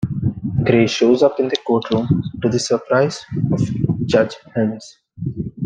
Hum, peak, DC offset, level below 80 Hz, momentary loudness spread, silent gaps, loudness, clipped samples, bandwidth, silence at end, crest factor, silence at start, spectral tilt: none; -2 dBFS; under 0.1%; -46 dBFS; 9 LU; none; -18 LUFS; under 0.1%; 9.6 kHz; 0 s; 16 dB; 0 s; -6.5 dB/octave